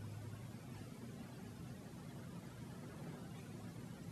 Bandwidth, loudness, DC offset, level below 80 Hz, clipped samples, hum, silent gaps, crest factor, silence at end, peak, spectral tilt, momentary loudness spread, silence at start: 13 kHz; -52 LUFS; under 0.1%; -70 dBFS; under 0.1%; none; none; 12 dB; 0 s; -38 dBFS; -6 dB/octave; 2 LU; 0 s